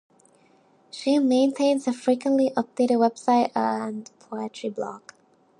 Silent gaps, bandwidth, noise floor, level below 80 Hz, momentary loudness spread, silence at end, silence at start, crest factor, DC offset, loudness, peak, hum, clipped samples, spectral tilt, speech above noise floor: none; 11.5 kHz; -59 dBFS; -80 dBFS; 14 LU; 0.6 s; 0.95 s; 16 dB; under 0.1%; -24 LUFS; -8 dBFS; none; under 0.1%; -5 dB/octave; 36 dB